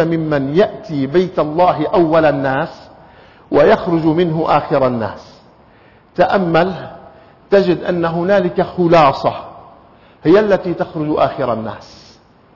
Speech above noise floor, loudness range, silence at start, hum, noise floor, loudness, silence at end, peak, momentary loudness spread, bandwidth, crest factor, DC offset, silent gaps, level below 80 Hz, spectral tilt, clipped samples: 33 dB; 3 LU; 0 s; none; -47 dBFS; -15 LUFS; 0.6 s; -2 dBFS; 12 LU; 6 kHz; 14 dB; under 0.1%; none; -48 dBFS; -8 dB/octave; under 0.1%